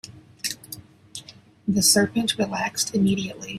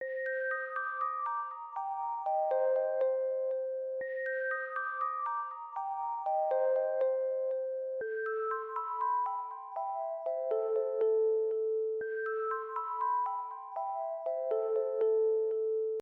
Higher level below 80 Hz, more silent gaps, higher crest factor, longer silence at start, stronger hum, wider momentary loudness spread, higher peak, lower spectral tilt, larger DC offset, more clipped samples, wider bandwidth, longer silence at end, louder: first, -58 dBFS vs under -90 dBFS; neither; first, 20 dB vs 12 dB; about the same, 0.05 s vs 0 s; neither; first, 23 LU vs 7 LU; first, -4 dBFS vs -22 dBFS; second, -3 dB/octave vs -4.5 dB/octave; neither; neither; first, 16 kHz vs 3.9 kHz; about the same, 0 s vs 0 s; first, -22 LUFS vs -34 LUFS